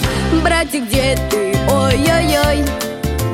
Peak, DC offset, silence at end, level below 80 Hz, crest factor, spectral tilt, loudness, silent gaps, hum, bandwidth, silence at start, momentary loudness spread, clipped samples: -2 dBFS; under 0.1%; 0 s; -24 dBFS; 12 dB; -5 dB/octave; -15 LUFS; none; none; 16.5 kHz; 0 s; 6 LU; under 0.1%